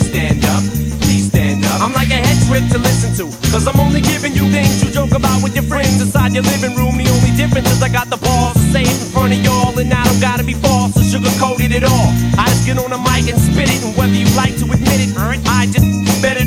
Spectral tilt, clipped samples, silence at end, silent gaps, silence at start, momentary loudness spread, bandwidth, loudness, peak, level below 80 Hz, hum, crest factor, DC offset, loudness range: -5 dB/octave; under 0.1%; 0 s; none; 0 s; 3 LU; 17 kHz; -13 LUFS; 0 dBFS; -24 dBFS; none; 12 dB; under 0.1%; 1 LU